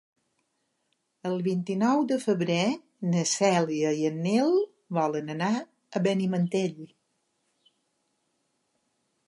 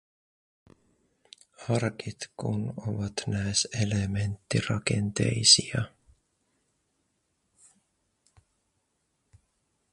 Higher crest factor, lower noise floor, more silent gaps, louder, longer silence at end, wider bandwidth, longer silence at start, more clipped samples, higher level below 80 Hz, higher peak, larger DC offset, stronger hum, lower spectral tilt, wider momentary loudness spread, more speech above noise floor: second, 18 dB vs 28 dB; about the same, -76 dBFS vs -76 dBFS; neither; about the same, -27 LUFS vs -27 LUFS; second, 2.4 s vs 4.05 s; about the same, 11.5 kHz vs 11.5 kHz; second, 1.25 s vs 1.6 s; neither; second, -80 dBFS vs -54 dBFS; second, -10 dBFS vs -4 dBFS; neither; neither; first, -5.5 dB/octave vs -3.5 dB/octave; second, 9 LU vs 16 LU; about the same, 51 dB vs 49 dB